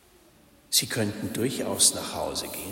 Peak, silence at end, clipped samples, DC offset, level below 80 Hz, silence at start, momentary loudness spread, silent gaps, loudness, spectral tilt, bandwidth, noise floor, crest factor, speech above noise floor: -6 dBFS; 0 s; under 0.1%; under 0.1%; -58 dBFS; 0.7 s; 10 LU; none; -25 LUFS; -2 dB/octave; 16.5 kHz; -57 dBFS; 24 dB; 29 dB